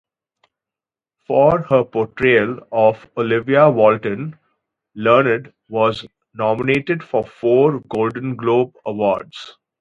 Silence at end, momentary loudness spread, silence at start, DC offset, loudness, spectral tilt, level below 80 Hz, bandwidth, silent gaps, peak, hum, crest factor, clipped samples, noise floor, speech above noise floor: 0.3 s; 11 LU; 1.3 s; under 0.1%; -17 LUFS; -8 dB/octave; -54 dBFS; 7.6 kHz; none; 0 dBFS; none; 18 dB; under 0.1%; -89 dBFS; 73 dB